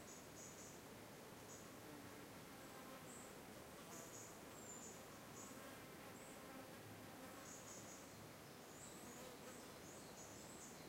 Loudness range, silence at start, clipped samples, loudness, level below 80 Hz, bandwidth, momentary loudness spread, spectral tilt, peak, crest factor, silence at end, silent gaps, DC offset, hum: 1 LU; 0 s; under 0.1%; -57 LUFS; -78 dBFS; 16 kHz; 3 LU; -3 dB/octave; -42 dBFS; 16 dB; 0 s; none; under 0.1%; none